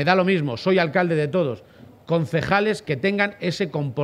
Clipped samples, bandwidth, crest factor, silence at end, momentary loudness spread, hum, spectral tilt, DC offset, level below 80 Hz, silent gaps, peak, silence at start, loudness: under 0.1%; 12.5 kHz; 20 dB; 0 s; 6 LU; none; -6.5 dB/octave; under 0.1%; -56 dBFS; none; -2 dBFS; 0 s; -22 LUFS